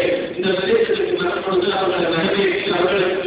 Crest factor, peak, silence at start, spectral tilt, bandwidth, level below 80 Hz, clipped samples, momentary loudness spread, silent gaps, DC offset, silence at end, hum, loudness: 12 dB; -6 dBFS; 0 s; -9 dB/octave; 4 kHz; -50 dBFS; under 0.1%; 3 LU; none; under 0.1%; 0 s; none; -18 LUFS